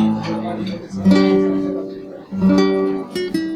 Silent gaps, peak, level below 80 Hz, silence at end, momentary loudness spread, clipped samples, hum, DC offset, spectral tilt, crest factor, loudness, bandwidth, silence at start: none; -2 dBFS; -50 dBFS; 0 s; 13 LU; under 0.1%; none; under 0.1%; -7.5 dB/octave; 14 dB; -18 LUFS; 11.5 kHz; 0 s